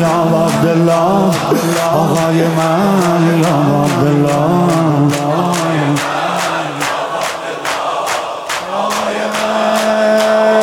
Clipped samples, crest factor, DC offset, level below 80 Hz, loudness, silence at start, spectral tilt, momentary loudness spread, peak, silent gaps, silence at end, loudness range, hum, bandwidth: under 0.1%; 12 dB; under 0.1%; -50 dBFS; -13 LUFS; 0 s; -5.5 dB/octave; 6 LU; -2 dBFS; none; 0 s; 5 LU; none; 18.5 kHz